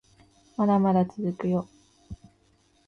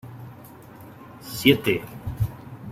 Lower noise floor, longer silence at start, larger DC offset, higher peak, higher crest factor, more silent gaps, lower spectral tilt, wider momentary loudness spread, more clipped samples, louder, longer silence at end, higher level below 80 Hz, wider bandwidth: first, -64 dBFS vs -44 dBFS; first, 0.6 s vs 0.05 s; neither; second, -12 dBFS vs -2 dBFS; second, 16 dB vs 24 dB; neither; first, -9.5 dB/octave vs -5.5 dB/octave; about the same, 25 LU vs 25 LU; neither; about the same, -25 LUFS vs -24 LUFS; first, 0.7 s vs 0 s; second, -58 dBFS vs -46 dBFS; second, 6.6 kHz vs 16.5 kHz